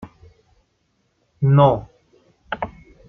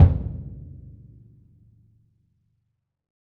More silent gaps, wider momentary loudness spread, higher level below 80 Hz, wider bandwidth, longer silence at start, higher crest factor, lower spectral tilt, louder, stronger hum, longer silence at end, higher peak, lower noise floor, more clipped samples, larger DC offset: neither; second, 18 LU vs 25 LU; second, -50 dBFS vs -34 dBFS; first, 3.8 kHz vs 2.4 kHz; about the same, 0 s vs 0 s; about the same, 20 dB vs 24 dB; second, -10 dB/octave vs -11.5 dB/octave; first, -19 LUFS vs -25 LUFS; neither; second, 0.4 s vs 2.7 s; about the same, -2 dBFS vs -2 dBFS; second, -67 dBFS vs -76 dBFS; neither; neither